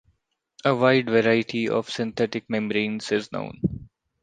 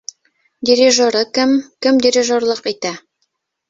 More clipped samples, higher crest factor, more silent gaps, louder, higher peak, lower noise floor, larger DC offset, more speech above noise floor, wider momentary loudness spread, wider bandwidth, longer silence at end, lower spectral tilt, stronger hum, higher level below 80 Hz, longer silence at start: neither; about the same, 20 dB vs 16 dB; neither; second, -24 LUFS vs -15 LUFS; second, -4 dBFS vs 0 dBFS; about the same, -71 dBFS vs -70 dBFS; neither; second, 48 dB vs 55 dB; second, 10 LU vs 13 LU; first, 9.4 kHz vs 7.8 kHz; second, 0.35 s vs 0.7 s; first, -6 dB/octave vs -2 dB/octave; neither; first, -54 dBFS vs -60 dBFS; about the same, 0.65 s vs 0.6 s